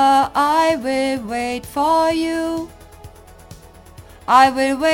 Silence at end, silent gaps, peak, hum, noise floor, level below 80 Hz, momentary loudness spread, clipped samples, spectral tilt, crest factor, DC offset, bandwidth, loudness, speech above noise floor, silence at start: 0 s; none; 0 dBFS; none; -42 dBFS; -46 dBFS; 11 LU; under 0.1%; -4 dB/octave; 18 dB; under 0.1%; 17 kHz; -17 LUFS; 24 dB; 0 s